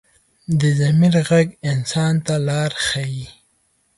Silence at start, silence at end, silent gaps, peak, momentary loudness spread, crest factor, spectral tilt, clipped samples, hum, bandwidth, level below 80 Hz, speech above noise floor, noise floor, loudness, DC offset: 0.5 s; 0.65 s; none; -4 dBFS; 12 LU; 14 dB; -6 dB/octave; under 0.1%; none; 11.5 kHz; -52 dBFS; 46 dB; -63 dBFS; -18 LUFS; under 0.1%